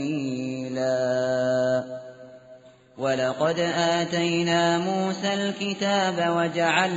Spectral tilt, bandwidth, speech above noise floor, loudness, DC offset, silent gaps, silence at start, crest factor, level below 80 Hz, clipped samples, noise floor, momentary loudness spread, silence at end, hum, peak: -3.5 dB/octave; 8 kHz; 26 dB; -24 LUFS; under 0.1%; none; 0 s; 18 dB; -66 dBFS; under 0.1%; -50 dBFS; 8 LU; 0 s; none; -8 dBFS